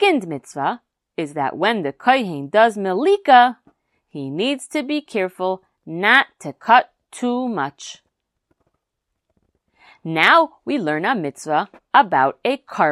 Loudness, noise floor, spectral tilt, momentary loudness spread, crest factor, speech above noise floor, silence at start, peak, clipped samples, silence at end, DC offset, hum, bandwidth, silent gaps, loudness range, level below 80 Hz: -18 LUFS; -78 dBFS; -4.5 dB/octave; 16 LU; 20 dB; 60 dB; 0 s; 0 dBFS; under 0.1%; 0 s; under 0.1%; none; 13 kHz; none; 5 LU; -72 dBFS